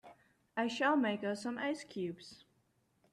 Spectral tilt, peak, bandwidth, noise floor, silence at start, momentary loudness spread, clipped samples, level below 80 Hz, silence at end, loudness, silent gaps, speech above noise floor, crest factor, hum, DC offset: -5 dB/octave; -20 dBFS; 12 kHz; -76 dBFS; 0.05 s; 12 LU; under 0.1%; -82 dBFS; 0.8 s; -36 LUFS; none; 40 dB; 18 dB; none; under 0.1%